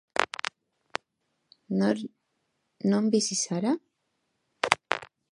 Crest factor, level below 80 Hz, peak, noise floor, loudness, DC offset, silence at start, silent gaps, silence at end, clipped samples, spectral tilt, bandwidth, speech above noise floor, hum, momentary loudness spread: 30 dB; -72 dBFS; 0 dBFS; -78 dBFS; -29 LUFS; under 0.1%; 0.2 s; none; 0.25 s; under 0.1%; -4 dB/octave; 11.5 kHz; 52 dB; none; 14 LU